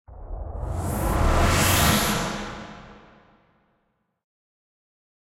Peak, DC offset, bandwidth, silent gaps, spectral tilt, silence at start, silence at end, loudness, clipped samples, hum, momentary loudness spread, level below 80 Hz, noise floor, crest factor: -6 dBFS; under 0.1%; 16 kHz; none; -4 dB/octave; 0.1 s; 2.4 s; -22 LUFS; under 0.1%; none; 21 LU; -32 dBFS; -72 dBFS; 20 dB